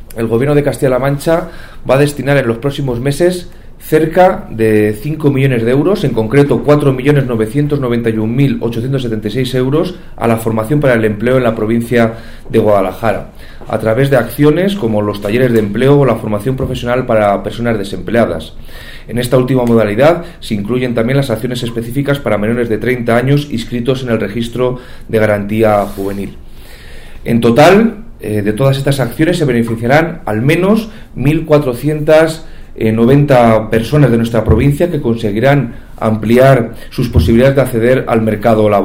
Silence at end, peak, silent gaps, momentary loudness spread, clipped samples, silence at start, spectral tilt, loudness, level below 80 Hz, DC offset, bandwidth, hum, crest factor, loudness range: 0 s; 0 dBFS; none; 9 LU; under 0.1%; 0 s; -7 dB/octave; -12 LUFS; -30 dBFS; under 0.1%; 16.5 kHz; none; 12 dB; 3 LU